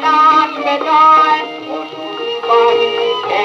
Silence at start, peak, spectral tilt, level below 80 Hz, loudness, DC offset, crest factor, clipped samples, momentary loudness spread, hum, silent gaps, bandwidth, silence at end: 0 s; 0 dBFS; -3 dB/octave; -82 dBFS; -11 LUFS; under 0.1%; 12 dB; under 0.1%; 15 LU; none; none; 7.8 kHz; 0 s